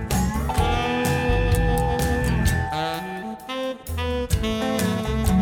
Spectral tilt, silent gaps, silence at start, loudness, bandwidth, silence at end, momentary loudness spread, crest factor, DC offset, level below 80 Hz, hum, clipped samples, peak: -5.5 dB/octave; none; 0 s; -24 LUFS; 19.5 kHz; 0 s; 8 LU; 14 dB; under 0.1%; -28 dBFS; none; under 0.1%; -8 dBFS